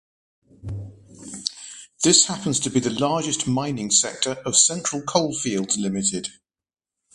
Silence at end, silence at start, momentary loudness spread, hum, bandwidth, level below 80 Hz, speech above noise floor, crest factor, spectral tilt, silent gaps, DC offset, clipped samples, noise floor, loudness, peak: 0.85 s; 0.65 s; 19 LU; none; 11.5 kHz; -54 dBFS; over 68 dB; 22 dB; -2.5 dB/octave; none; under 0.1%; under 0.1%; under -90 dBFS; -21 LUFS; -2 dBFS